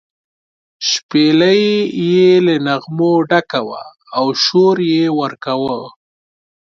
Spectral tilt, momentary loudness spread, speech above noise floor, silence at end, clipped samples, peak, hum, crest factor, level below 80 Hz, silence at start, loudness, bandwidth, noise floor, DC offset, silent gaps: -5 dB/octave; 10 LU; over 77 dB; 0.75 s; under 0.1%; 0 dBFS; none; 14 dB; -62 dBFS; 0.8 s; -14 LUFS; 7.4 kHz; under -90 dBFS; under 0.1%; 1.03-1.09 s